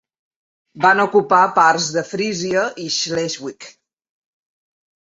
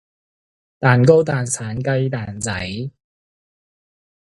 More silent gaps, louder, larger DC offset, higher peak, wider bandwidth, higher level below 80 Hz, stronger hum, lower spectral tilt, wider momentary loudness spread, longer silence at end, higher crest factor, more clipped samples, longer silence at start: neither; about the same, -17 LUFS vs -18 LUFS; neither; about the same, 0 dBFS vs 0 dBFS; second, 8 kHz vs 11.5 kHz; second, -64 dBFS vs -50 dBFS; neither; second, -3 dB/octave vs -5.5 dB/octave; second, 9 LU vs 14 LU; about the same, 1.35 s vs 1.4 s; about the same, 18 dB vs 20 dB; neither; about the same, 0.75 s vs 0.8 s